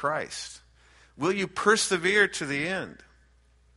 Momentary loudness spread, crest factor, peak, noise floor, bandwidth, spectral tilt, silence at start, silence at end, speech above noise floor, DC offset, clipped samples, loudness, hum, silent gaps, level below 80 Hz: 15 LU; 20 dB; -8 dBFS; -61 dBFS; 11.5 kHz; -3 dB/octave; 0 s; 0.8 s; 34 dB; under 0.1%; under 0.1%; -26 LUFS; none; none; -62 dBFS